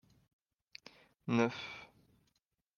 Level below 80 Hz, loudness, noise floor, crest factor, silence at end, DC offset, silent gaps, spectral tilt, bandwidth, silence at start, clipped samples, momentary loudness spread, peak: -80 dBFS; -36 LUFS; -82 dBFS; 26 dB; 0.9 s; under 0.1%; none; -6 dB/octave; 7 kHz; 1.25 s; under 0.1%; 22 LU; -16 dBFS